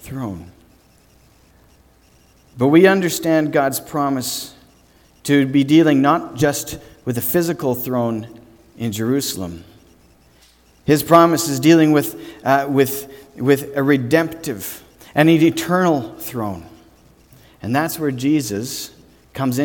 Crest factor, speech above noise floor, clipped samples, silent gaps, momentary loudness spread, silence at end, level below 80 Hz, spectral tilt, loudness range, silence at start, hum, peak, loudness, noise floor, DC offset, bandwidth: 18 dB; 36 dB; under 0.1%; none; 17 LU; 0 s; -52 dBFS; -5.5 dB/octave; 6 LU; 0.05 s; none; 0 dBFS; -17 LUFS; -52 dBFS; under 0.1%; 19 kHz